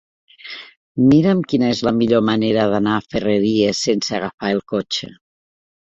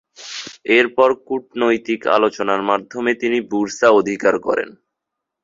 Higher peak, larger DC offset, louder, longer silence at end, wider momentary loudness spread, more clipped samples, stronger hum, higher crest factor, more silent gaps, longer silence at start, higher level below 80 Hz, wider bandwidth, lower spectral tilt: about the same, -2 dBFS vs 0 dBFS; neither; about the same, -17 LUFS vs -17 LUFS; first, 0.85 s vs 0.7 s; first, 17 LU vs 12 LU; neither; neither; about the same, 16 dB vs 18 dB; first, 0.77-0.95 s, 4.34-4.38 s vs none; first, 0.45 s vs 0.2 s; first, -52 dBFS vs -62 dBFS; about the same, 8.2 kHz vs 7.8 kHz; first, -5.5 dB/octave vs -4 dB/octave